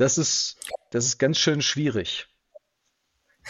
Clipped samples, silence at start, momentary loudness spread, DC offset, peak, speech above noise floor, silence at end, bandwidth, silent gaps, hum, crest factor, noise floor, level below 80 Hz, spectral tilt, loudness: under 0.1%; 0 s; 10 LU; under 0.1%; -8 dBFS; 51 dB; 0 s; 13 kHz; none; none; 18 dB; -74 dBFS; -62 dBFS; -3 dB/octave; -23 LUFS